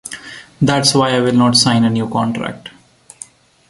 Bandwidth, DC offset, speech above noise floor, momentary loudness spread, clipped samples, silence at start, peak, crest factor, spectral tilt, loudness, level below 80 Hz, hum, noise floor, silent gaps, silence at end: 11.5 kHz; under 0.1%; 26 dB; 24 LU; under 0.1%; 0.05 s; 0 dBFS; 16 dB; -4.5 dB/octave; -14 LUFS; -52 dBFS; none; -39 dBFS; none; 1 s